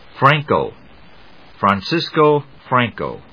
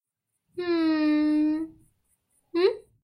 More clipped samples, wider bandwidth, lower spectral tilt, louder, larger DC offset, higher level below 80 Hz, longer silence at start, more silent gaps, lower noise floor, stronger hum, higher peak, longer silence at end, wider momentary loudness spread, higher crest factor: neither; second, 5.4 kHz vs 9.8 kHz; about the same, -7 dB/octave vs -6 dB/octave; first, -17 LUFS vs -25 LUFS; first, 0.3% vs under 0.1%; first, -52 dBFS vs -66 dBFS; second, 0.15 s vs 0.55 s; neither; second, -46 dBFS vs -80 dBFS; neither; first, 0 dBFS vs -12 dBFS; about the same, 0.15 s vs 0.2 s; second, 7 LU vs 12 LU; about the same, 18 dB vs 16 dB